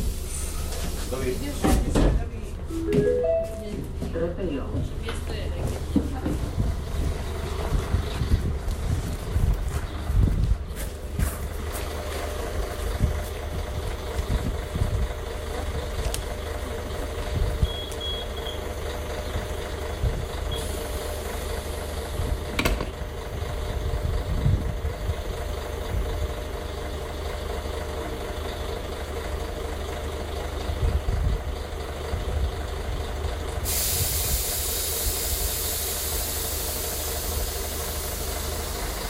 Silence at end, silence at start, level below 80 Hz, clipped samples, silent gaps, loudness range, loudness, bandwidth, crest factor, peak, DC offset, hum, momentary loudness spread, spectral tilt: 0 s; 0 s; -30 dBFS; under 0.1%; none; 5 LU; -29 LUFS; 16 kHz; 20 dB; -8 dBFS; under 0.1%; none; 8 LU; -4.5 dB/octave